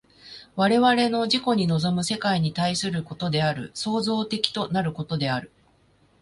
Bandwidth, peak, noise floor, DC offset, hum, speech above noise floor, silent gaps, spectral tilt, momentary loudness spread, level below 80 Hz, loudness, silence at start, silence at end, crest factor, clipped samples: 11.5 kHz; -2 dBFS; -61 dBFS; under 0.1%; none; 37 dB; none; -5 dB/octave; 9 LU; -58 dBFS; -24 LUFS; 0.25 s; 0.75 s; 24 dB; under 0.1%